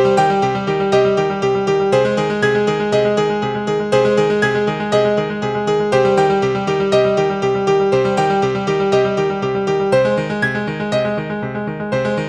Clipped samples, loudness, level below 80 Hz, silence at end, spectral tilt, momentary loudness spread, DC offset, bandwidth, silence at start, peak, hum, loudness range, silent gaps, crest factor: under 0.1%; -16 LUFS; -48 dBFS; 0 s; -6 dB/octave; 5 LU; under 0.1%; 9.8 kHz; 0 s; -2 dBFS; none; 2 LU; none; 14 dB